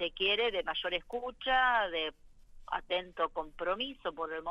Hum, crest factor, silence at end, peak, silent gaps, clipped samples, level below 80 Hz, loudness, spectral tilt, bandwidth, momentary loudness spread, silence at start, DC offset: none; 16 dB; 0 s; -18 dBFS; none; under 0.1%; -56 dBFS; -33 LUFS; -4 dB/octave; 8 kHz; 10 LU; 0 s; under 0.1%